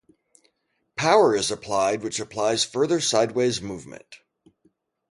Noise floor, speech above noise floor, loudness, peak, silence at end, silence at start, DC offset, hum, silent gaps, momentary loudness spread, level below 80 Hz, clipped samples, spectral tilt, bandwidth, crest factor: -73 dBFS; 51 dB; -22 LUFS; -6 dBFS; 0.95 s; 0.95 s; under 0.1%; none; none; 18 LU; -60 dBFS; under 0.1%; -3.5 dB/octave; 11.5 kHz; 20 dB